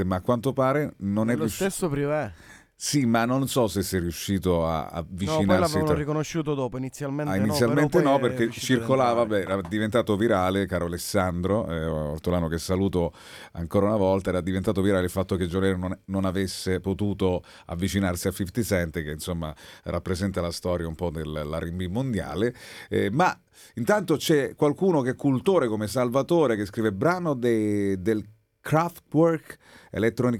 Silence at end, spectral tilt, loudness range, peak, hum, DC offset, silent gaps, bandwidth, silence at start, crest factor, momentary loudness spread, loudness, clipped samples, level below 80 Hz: 0 s; -6 dB/octave; 5 LU; -6 dBFS; none; under 0.1%; none; 18 kHz; 0 s; 18 dB; 9 LU; -25 LUFS; under 0.1%; -50 dBFS